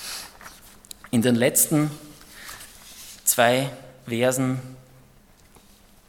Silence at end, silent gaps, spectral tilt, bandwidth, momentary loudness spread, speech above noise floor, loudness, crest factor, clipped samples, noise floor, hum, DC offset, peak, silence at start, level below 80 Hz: 1.35 s; none; -4 dB/octave; 17.5 kHz; 24 LU; 32 dB; -22 LUFS; 24 dB; under 0.1%; -53 dBFS; none; under 0.1%; -2 dBFS; 0 s; -58 dBFS